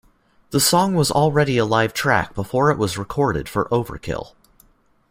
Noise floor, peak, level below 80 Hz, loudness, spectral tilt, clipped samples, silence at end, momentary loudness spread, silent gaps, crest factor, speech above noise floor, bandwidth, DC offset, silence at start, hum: -56 dBFS; -2 dBFS; -46 dBFS; -19 LUFS; -4.5 dB/octave; under 0.1%; 0.85 s; 9 LU; none; 18 dB; 37 dB; 16 kHz; under 0.1%; 0.5 s; none